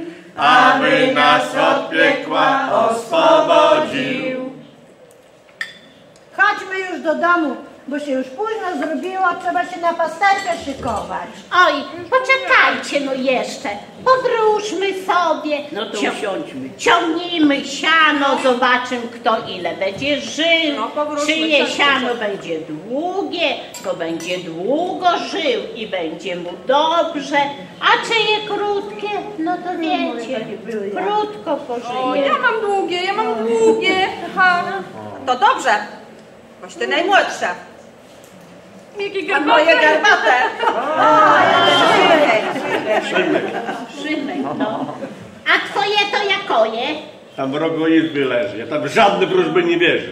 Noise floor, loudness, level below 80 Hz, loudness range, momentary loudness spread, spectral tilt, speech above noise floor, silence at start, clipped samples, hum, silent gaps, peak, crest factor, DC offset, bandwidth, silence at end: -46 dBFS; -16 LUFS; -60 dBFS; 7 LU; 13 LU; -3.5 dB/octave; 30 dB; 0 s; under 0.1%; none; none; 0 dBFS; 16 dB; under 0.1%; 15 kHz; 0 s